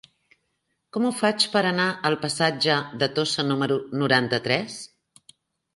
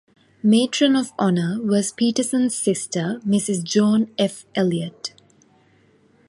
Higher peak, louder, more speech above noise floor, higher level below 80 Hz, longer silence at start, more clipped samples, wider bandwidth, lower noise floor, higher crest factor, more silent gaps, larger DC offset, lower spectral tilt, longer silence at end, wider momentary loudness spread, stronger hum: about the same, -4 dBFS vs -4 dBFS; second, -23 LUFS vs -20 LUFS; first, 52 dB vs 37 dB; about the same, -66 dBFS vs -66 dBFS; first, 0.95 s vs 0.45 s; neither; about the same, 11.5 kHz vs 11.5 kHz; first, -75 dBFS vs -57 dBFS; about the same, 22 dB vs 18 dB; neither; neither; about the same, -4 dB/octave vs -5 dB/octave; second, 0.9 s vs 1.2 s; about the same, 6 LU vs 7 LU; neither